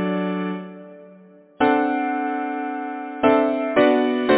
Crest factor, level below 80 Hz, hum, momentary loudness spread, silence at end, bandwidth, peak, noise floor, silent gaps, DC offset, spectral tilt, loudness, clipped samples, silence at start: 18 dB; -60 dBFS; none; 12 LU; 0 s; 4 kHz; -2 dBFS; -48 dBFS; none; under 0.1%; -10 dB/octave; -21 LUFS; under 0.1%; 0 s